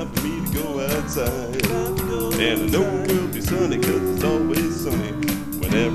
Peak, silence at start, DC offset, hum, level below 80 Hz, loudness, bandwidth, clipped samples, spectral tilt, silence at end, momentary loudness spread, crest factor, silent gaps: -4 dBFS; 0 s; 0.3%; none; -36 dBFS; -22 LUFS; 15 kHz; under 0.1%; -5 dB/octave; 0 s; 4 LU; 18 dB; none